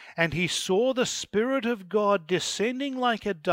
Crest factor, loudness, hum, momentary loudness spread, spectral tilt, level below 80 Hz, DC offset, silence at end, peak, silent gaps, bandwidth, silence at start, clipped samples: 20 dB; -26 LUFS; none; 3 LU; -4 dB/octave; -58 dBFS; under 0.1%; 0 s; -6 dBFS; none; 16 kHz; 0 s; under 0.1%